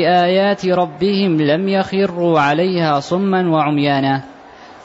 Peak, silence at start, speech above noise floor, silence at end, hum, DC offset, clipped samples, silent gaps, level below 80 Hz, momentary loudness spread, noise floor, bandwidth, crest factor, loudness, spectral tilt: -4 dBFS; 0 s; 24 dB; 0.05 s; none; under 0.1%; under 0.1%; none; -56 dBFS; 3 LU; -39 dBFS; 8 kHz; 12 dB; -16 LUFS; -7 dB/octave